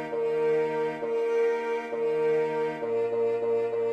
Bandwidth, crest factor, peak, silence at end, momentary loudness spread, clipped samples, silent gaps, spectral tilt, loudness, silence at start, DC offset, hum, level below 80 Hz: 8.2 kHz; 10 dB; -16 dBFS; 0 s; 4 LU; under 0.1%; none; -6 dB/octave; -27 LUFS; 0 s; under 0.1%; none; -74 dBFS